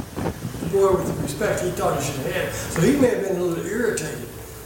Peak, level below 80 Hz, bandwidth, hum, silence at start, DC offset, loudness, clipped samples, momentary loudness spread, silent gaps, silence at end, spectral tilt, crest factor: -6 dBFS; -42 dBFS; 17 kHz; none; 0 s; under 0.1%; -23 LUFS; under 0.1%; 10 LU; none; 0 s; -5.5 dB/octave; 16 dB